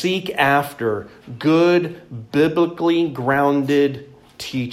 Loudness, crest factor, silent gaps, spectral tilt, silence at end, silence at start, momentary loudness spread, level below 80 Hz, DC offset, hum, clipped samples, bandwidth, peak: -19 LUFS; 16 dB; none; -6 dB/octave; 0 s; 0 s; 13 LU; -58 dBFS; under 0.1%; none; under 0.1%; 15.5 kHz; -2 dBFS